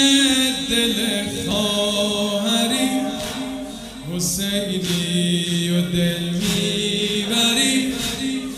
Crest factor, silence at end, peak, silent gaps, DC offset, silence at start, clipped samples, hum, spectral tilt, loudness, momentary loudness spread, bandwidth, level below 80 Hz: 18 dB; 0 s; -2 dBFS; none; under 0.1%; 0 s; under 0.1%; none; -3.5 dB/octave; -19 LUFS; 9 LU; 16 kHz; -46 dBFS